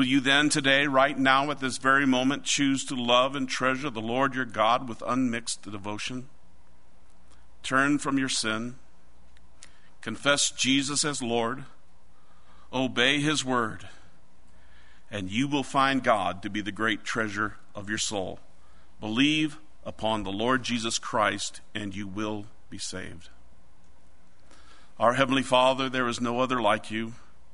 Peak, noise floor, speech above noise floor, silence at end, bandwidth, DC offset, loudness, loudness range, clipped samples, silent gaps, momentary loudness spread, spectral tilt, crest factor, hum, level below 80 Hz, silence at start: -6 dBFS; -60 dBFS; 34 dB; 0.4 s; 11 kHz; 1%; -26 LUFS; 6 LU; under 0.1%; none; 14 LU; -3 dB/octave; 22 dB; none; -58 dBFS; 0 s